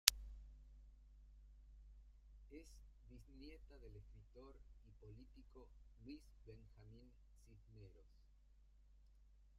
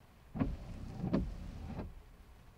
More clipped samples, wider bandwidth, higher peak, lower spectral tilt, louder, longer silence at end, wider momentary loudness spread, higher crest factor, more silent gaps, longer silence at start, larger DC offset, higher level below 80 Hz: neither; second, 13 kHz vs 16 kHz; first, -4 dBFS vs -20 dBFS; second, -0.5 dB/octave vs -8.5 dB/octave; second, -52 LUFS vs -42 LUFS; about the same, 0 s vs 0 s; second, 9 LU vs 21 LU; first, 48 dB vs 22 dB; neither; about the same, 0.05 s vs 0 s; neither; second, -62 dBFS vs -48 dBFS